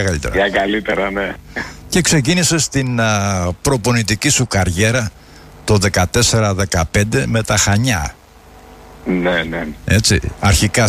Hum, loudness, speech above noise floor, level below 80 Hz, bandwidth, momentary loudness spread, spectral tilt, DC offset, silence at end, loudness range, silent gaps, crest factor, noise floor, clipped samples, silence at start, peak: none; -15 LUFS; 27 dB; -32 dBFS; 15.5 kHz; 9 LU; -4 dB/octave; under 0.1%; 0 s; 2 LU; none; 14 dB; -42 dBFS; under 0.1%; 0 s; -2 dBFS